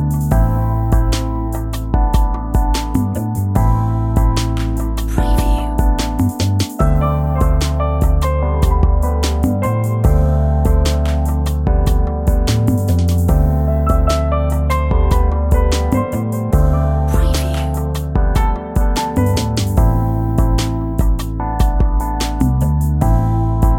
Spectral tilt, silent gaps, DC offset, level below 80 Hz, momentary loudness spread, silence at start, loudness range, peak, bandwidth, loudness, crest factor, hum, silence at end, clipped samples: -6.5 dB/octave; none; under 0.1%; -16 dBFS; 4 LU; 0 s; 2 LU; 0 dBFS; 17 kHz; -16 LUFS; 14 dB; none; 0 s; under 0.1%